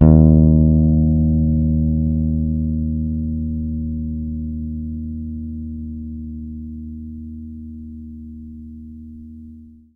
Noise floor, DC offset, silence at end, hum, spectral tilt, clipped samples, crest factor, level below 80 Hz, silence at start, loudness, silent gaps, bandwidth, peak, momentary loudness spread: -41 dBFS; under 0.1%; 0.25 s; none; -15 dB/octave; under 0.1%; 18 dB; -26 dBFS; 0 s; -18 LUFS; none; 1.5 kHz; 0 dBFS; 23 LU